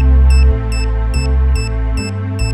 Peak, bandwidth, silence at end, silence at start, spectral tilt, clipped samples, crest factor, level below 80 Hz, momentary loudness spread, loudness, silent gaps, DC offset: -2 dBFS; 11 kHz; 0 s; 0 s; -6.5 dB/octave; under 0.1%; 10 dB; -12 dBFS; 8 LU; -15 LUFS; none; under 0.1%